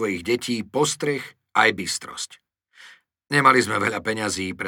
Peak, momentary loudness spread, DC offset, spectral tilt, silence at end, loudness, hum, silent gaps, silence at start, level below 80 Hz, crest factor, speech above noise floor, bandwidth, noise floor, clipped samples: -2 dBFS; 13 LU; under 0.1%; -3.5 dB/octave; 0 s; -22 LUFS; none; none; 0 s; -62 dBFS; 20 dB; 28 dB; 19.5 kHz; -50 dBFS; under 0.1%